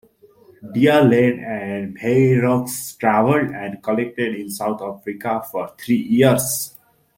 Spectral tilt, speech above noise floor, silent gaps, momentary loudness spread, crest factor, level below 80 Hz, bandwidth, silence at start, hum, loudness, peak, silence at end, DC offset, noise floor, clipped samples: -5.5 dB/octave; 32 dB; none; 13 LU; 18 dB; -58 dBFS; 16.5 kHz; 0.6 s; none; -19 LUFS; -2 dBFS; 0.5 s; under 0.1%; -50 dBFS; under 0.1%